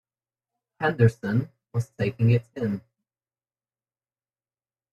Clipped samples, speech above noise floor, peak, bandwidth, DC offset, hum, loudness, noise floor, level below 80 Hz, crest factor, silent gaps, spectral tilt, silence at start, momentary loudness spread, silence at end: under 0.1%; over 67 dB; -6 dBFS; 8.2 kHz; under 0.1%; none; -26 LUFS; under -90 dBFS; -60 dBFS; 22 dB; none; -8.5 dB/octave; 0.8 s; 10 LU; 2.15 s